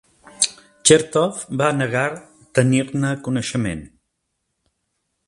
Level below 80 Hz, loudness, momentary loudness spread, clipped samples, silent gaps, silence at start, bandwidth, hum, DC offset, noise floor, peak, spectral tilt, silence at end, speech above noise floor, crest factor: -52 dBFS; -19 LUFS; 10 LU; under 0.1%; none; 0.4 s; 11.5 kHz; none; under 0.1%; -75 dBFS; 0 dBFS; -4 dB/octave; 1.4 s; 56 dB; 22 dB